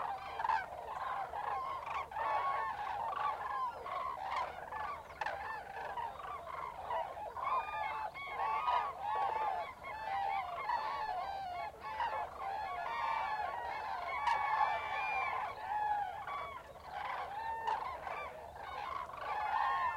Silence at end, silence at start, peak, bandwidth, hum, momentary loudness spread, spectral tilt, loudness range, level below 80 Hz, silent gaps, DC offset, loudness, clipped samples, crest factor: 0 s; 0 s; -20 dBFS; 16.5 kHz; none; 8 LU; -3.5 dB/octave; 5 LU; -66 dBFS; none; under 0.1%; -39 LUFS; under 0.1%; 18 dB